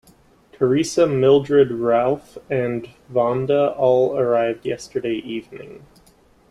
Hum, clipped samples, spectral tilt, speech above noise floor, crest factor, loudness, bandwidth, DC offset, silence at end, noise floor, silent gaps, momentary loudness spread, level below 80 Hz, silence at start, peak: none; under 0.1%; -6 dB/octave; 35 dB; 16 dB; -19 LUFS; 12 kHz; under 0.1%; 0.75 s; -54 dBFS; none; 12 LU; -56 dBFS; 0.6 s; -4 dBFS